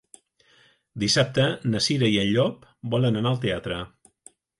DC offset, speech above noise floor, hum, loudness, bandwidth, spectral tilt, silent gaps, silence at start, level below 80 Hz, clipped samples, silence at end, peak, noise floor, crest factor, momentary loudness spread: under 0.1%; 37 dB; none; -24 LUFS; 11.5 kHz; -5 dB/octave; none; 0.95 s; -54 dBFS; under 0.1%; 0.7 s; -8 dBFS; -60 dBFS; 18 dB; 12 LU